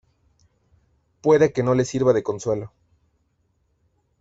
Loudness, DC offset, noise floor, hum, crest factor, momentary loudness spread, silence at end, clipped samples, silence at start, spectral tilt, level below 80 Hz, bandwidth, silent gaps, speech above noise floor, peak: -21 LUFS; under 0.1%; -68 dBFS; none; 18 dB; 10 LU; 1.55 s; under 0.1%; 1.25 s; -6.5 dB/octave; -56 dBFS; 8 kHz; none; 48 dB; -6 dBFS